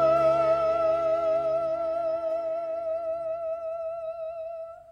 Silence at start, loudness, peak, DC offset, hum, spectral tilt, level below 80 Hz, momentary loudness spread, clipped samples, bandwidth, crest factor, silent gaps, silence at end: 0 s; -27 LUFS; -14 dBFS; under 0.1%; none; -6.5 dB/octave; -60 dBFS; 13 LU; under 0.1%; 6.6 kHz; 14 dB; none; 0 s